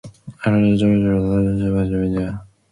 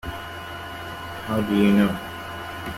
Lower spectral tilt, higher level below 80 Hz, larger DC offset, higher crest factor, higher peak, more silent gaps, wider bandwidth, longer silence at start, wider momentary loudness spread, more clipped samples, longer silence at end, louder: first, -9 dB/octave vs -6.5 dB/octave; first, -38 dBFS vs -48 dBFS; neither; second, 12 dB vs 18 dB; about the same, -6 dBFS vs -6 dBFS; neither; second, 10.5 kHz vs 15.5 kHz; about the same, 0.05 s vs 0.05 s; second, 9 LU vs 15 LU; neither; first, 0.25 s vs 0 s; first, -18 LUFS vs -25 LUFS